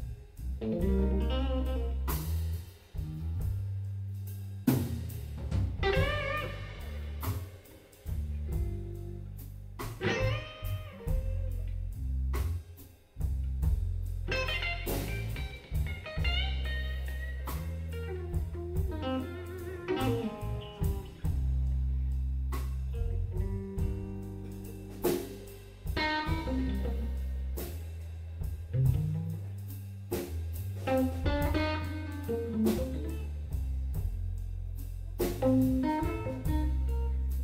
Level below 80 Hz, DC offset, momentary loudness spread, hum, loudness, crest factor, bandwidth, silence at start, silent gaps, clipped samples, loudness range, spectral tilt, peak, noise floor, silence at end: -36 dBFS; under 0.1%; 11 LU; none; -34 LUFS; 20 dB; 16 kHz; 0 s; none; under 0.1%; 4 LU; -6.5 dB/octave; -14 dBFS; -53 dBFS; 0 s